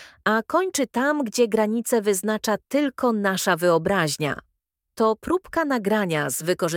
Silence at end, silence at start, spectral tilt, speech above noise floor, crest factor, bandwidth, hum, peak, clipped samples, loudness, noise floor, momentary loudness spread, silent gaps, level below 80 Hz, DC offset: 0 s; 0 s; -4 dB/octave; 54 dB; 18 dB; 18 kHz; none; -4 dBFS; under 0.1%; -23 LUFS; -77 dBFS; 4 LU; none; -58 dBFS; under 0.1%